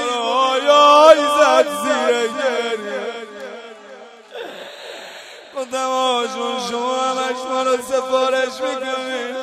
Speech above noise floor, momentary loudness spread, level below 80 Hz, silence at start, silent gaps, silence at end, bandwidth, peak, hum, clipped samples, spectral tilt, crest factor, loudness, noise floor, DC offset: 20 dB; 22 LU; -66 dBFS; 0 s; none; 0 s; 15 kHz; 0 dBFS; none; under 0.1%; -1.5 dB/octave; 18 dB; -17 LUFS; -40 dBFS; under 0.1%